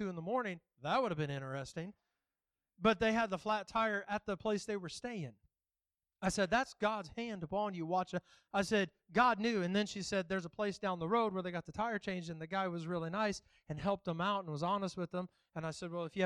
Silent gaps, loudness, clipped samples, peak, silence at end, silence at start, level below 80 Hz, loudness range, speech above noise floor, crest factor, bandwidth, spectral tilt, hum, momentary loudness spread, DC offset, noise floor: none; -37 LUFS; under 0.1%; -18 dBFS; 0 s; 0 s; -66 dBFS; 3 LU; over 53 dB; 20 dB; 12 kHz; -5 dB/octave; none; 10 LU; under 0.1%; under -90 dBFS